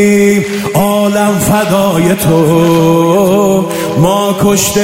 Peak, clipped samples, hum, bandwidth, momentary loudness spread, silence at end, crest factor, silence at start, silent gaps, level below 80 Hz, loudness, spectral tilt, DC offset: 0 dBFS; under 0.1%; none; 16.5 kHz; 4 LU; 0 s; 8 dB; 0 s; none; -38 dBFS; -9 LUFS; -5.5 dB/octave; 0.3%